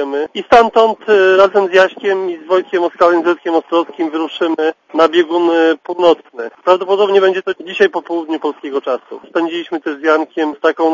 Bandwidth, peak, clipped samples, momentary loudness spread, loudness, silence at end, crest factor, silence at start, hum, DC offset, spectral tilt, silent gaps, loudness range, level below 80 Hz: 7.4 kHz; 0 dBFS; 0.2%; 10 LU; -14 LUFS; 0 s; 14 dB; 0 s; none; under 0.1%; -4.5 dB/octave; none; 5 LU; -54 dBFS